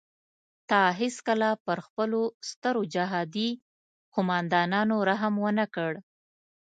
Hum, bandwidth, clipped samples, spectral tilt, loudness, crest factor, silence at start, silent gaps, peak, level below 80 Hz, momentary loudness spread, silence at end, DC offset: none; 9.2 kHz; under 0.1%; -5.5 dB/octave; -28 LUFS; 20 dB; 0.7 s; 1.60-1.65 s, 1.90-1.97 s, 2.34-2.41 s, 2.56-2.62 s, 3.62-4.12 s; -8 dBFS; -76 dBFS; 8 LU; 0.75 s; under 0.1%